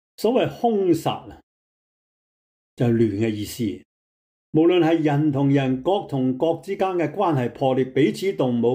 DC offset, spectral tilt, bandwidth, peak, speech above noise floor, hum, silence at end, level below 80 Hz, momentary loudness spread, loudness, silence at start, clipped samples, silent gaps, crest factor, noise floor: under 0.1%; -7 dB/octave; 16 kHz; -8 dBFS; over 69 dB; none; 0 s; -60 dBFS; 7 LU; -22 LUFS; 0.2 s; under 0.1%; 1.43-2.77 s, 3.85-4.53 s; 14 dB; under -90 dBFS